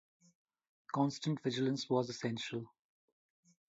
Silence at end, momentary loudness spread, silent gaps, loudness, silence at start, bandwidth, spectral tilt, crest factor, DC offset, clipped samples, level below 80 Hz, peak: 1.1 s; 8 LU; none; -37 LUFS; 0.9 s; 7.6 kHz; -5.5 dB/octave; 20 dB; under 0.1%; under 0.1%; -82 dBFS; -20 dBFS